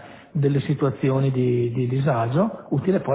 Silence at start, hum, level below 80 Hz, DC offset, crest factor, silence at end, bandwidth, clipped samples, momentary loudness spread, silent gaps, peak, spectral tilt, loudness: 0 s; none; -56 dBFS; under 0.1%; 14 dB; 0 s; 4 kHz; under 0.1%; 3 LU; none; -8 dBFS; -12.5 dB/octave; -22 LUFS